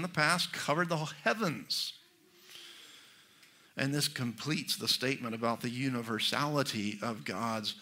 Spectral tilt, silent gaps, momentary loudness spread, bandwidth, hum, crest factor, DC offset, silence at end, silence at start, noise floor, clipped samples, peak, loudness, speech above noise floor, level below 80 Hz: -3.5 dB/octave; none; 17 LU; 16 kHz; none; 22 dB; under 0.1%; 0 s; 0 s; -62 dBFS; under 0.1%; -12 dBFS; -33 LUFS; 28 dB; -78 dBFS